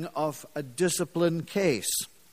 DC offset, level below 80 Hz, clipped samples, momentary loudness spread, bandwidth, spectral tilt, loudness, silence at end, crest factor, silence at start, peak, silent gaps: 0.1%; -66 dBFS; under 0.1%; 6 LU; 15.5 kHz; -4 dB/octave; -28 LUFS; 0.25 s; 18 dB; 0 s; -12 dBFS; none